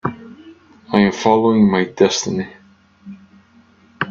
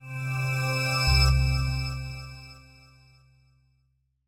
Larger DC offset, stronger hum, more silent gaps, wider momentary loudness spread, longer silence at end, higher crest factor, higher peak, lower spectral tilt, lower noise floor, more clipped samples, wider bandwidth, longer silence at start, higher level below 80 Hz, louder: neither; neither; neither; second, 14 LU vs 20 LU; second, 0 s vs 1.7 s; about the same, 18 dB vs 18 dB; first, 0 dBFS vs -10 dBFS; about the same, -5 dB/octave vs -4.5 dB/octave; second, -51 dBFS vs -71 dBFS; neither; second, 7.4 kHz vs 16 kHz; about the same, 0.05 s vs 0 s; second, -56 dBFS vs -32 dBFS; first, -16 LUFS vs -25 LUFS